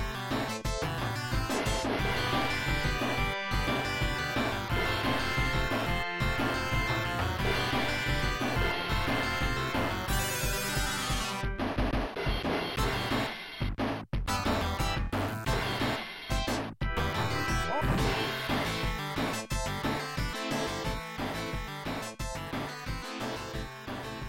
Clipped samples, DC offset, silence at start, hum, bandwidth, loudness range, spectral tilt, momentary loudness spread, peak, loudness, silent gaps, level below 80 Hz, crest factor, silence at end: under 0.1%; under 0.1%; 0 s; none; 17 kHz; 4 LU; -4.5 dB/octave; 7 LU; -16 dBFS; -31 LUFS; none; -38 dBFS; 14 dB; 0 s